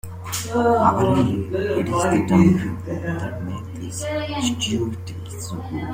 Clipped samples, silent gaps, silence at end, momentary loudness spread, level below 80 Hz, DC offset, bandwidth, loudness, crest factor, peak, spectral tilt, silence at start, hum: under 0.1%; none; 0 s; 14 LU; -48 dBFS; under 0.1%; 16 kHz; -21 LUFS; 18 dB; -2 dBFS; -6 dB/octave; 0.05 s; none